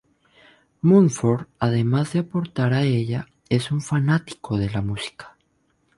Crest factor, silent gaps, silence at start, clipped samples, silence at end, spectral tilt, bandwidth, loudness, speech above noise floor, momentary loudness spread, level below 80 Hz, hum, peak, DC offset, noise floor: 18 dB; none; 0.85 s; under 0.1%; 0.7 s; -7 dB/octave; 11.5 kHz; -22 LUFS; 46 dB; 11 LU; -50 dBFS; none; -4 dBFS; under 0.1%; -66 dBFS